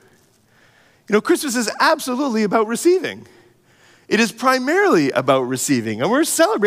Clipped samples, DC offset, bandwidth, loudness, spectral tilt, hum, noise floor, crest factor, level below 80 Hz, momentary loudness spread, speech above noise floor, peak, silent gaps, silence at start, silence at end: under 0.1%; under 0.1%; 16 kHz; -18 LUFS; -4 dB/octave; none; -55 dBFS; 16 dB; -72 dBFS; 5 LU; 38 dB; -2 dBFS; none; 1.1 s; 0 s